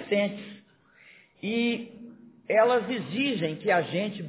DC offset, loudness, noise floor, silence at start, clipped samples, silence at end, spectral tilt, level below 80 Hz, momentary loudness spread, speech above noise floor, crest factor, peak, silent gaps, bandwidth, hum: under 0.1%; -27 LUFS; -58 dBFS; 0 s; under 0.1%; 0 s; -9.5 dB/octave; -74 dBFS; 19 LU; 31 dB; 18 dB; -10 dBFS; none; 4 kHz; none